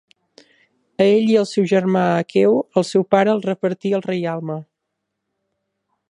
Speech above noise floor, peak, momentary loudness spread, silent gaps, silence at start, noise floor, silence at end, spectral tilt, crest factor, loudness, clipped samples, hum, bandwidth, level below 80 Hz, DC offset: 61 dB; 0 dBFS; 9 LU; none; 1 s; -78 dBFS; 1.5 s; -6.5 dB/octave; 18 dB; -18 LUFS; under 0.1%; none; 11 kHz; -68 dBFS; under 0.1%